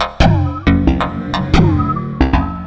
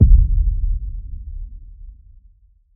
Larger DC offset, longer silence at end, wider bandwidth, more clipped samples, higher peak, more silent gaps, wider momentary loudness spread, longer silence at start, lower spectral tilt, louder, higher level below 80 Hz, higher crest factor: neither; second, 0 s vs 0.85 s; first, 8 kHz vs 0.5 kHz; neither; about the same, 0 dBFS vs 0 dBFS; neither; second, 6 LU vs 26 LU; about the same, 0 s vs 0 s; second, -7.5 dB/octave vs -19.5 dB/octave; first, -15 LUFS vs -21 LUFS; about the same, -20 dBFS vs -18 dBFS; about the same, 14 dB vs 18 dB